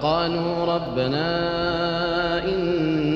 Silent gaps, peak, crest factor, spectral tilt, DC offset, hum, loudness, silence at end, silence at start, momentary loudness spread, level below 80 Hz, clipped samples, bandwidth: none; -8 dBFS; 14 dB; -7.5 dB/octave; under 0.1%; none; -23 LUFS; 0 s; 0 s; 2 LU; -44 dBFS; under 0.1%; 7.4 kHz